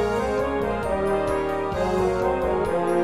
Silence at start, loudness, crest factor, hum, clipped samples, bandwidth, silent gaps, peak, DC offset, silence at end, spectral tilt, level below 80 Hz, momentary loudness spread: 0 s; -24 LUFS; 12 dB; none; under 0.1%; 14.5 kHz; none; -12 dBFS; 0.5%; 0 s; -6.5 dB/octave; -38 dBFS; 2 LU